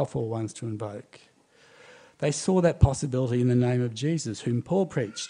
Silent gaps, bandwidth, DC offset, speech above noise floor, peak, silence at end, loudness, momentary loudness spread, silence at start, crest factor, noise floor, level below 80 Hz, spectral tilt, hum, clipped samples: none; 10.5 kHz; under 0.1%; 32 dB; -4 dBFS; 0 s; -26 LUFS; 11 LU; 0 s; 22 dB; -58 dBFS; -44 dBFS; -6.5 dB/octave; none; under 0.1%